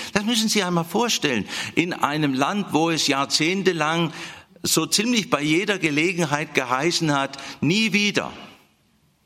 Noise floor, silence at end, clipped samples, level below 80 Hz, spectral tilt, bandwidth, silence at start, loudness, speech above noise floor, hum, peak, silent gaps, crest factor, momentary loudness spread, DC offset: -62 dBFS; 0.7 s; under 0.1%; -62 dBFS; -3.5 dB/octave; 16.5 kHz; 0 s; -21 LUFS; 40 dB; none; -2 dBFS; none; 20 dB; 7 LU; under 0.1%